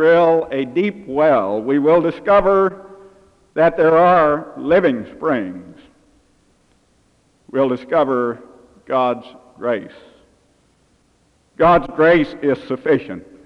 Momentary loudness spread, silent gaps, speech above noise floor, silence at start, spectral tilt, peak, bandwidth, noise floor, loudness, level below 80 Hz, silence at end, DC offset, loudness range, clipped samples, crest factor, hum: 12 LU; none; 43 dB; 0 s; -8 dB/octave; -2 dBFS; 6.2 kHz; -59 dBFS; -16 LUFS; -48 dBFS; 0.25 s; under 0.1%; 8 LU; under 0.1%; 14 dB; none